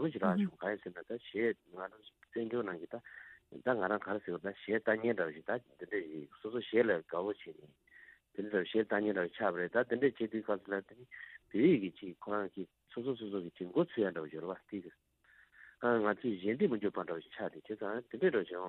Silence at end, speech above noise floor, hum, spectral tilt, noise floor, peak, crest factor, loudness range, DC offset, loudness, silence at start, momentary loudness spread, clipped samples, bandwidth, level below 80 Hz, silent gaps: 0 s; 31 dB; none; -9 dB/octave; -67 dBFS; -16 dBFS; 20 dB; 4 LU; under 0.1%; -36 LUFS; 0 s; 15 LU; under 0.1%; 4.2 kHz; -80 dBFS; none